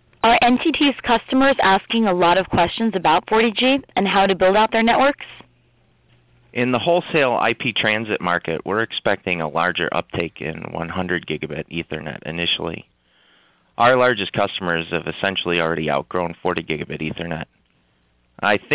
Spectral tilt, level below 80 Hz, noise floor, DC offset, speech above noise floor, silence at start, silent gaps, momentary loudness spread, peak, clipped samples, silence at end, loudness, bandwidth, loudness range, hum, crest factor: -9 dB/octave; -48 dBFS; -62 dBFS; under 0.1%; 43 dB; 0.25 s; none; 12 LU; -6 dBFS; under 0.1%; 0 s; -19 LUFS; 4 kHz; 7 LU; none; 14 dB